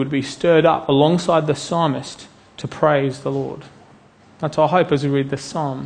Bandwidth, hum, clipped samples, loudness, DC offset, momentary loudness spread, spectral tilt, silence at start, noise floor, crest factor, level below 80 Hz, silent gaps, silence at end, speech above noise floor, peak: 9.8 kHz; none; under 0.1%; -18 LUFS; under 0.1%; 15 LU; -6 dB/octave; 0 s; -49 dBFS; 18 dB; -54 dBFS; none; 0 s; 30 dB; -2 dBFS